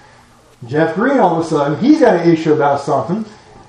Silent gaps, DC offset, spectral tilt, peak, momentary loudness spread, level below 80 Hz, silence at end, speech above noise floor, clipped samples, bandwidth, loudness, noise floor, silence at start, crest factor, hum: none; under 0.1%; -7 dB/octave; 0 dBFS; 11 LU; -56 dBFS; 0.35 s; 33 dB; under 0.1%; 10 kHz; -14 LUFS; -46 dBFS; 0.6 s; 14 dB; none